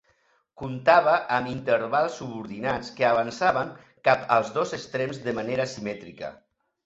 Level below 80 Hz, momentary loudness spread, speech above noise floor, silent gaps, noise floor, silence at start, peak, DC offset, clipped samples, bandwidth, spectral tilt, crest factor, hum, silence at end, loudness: -62 dBFS; 16 LU; 42 dB; none; -67 dBFS; 0.6 s; -4 dBFS; under 0.1%; under 0.1%; 8 kHz; -5 dB/octave; 22 dB; none; 0.5 s; -25 LUFS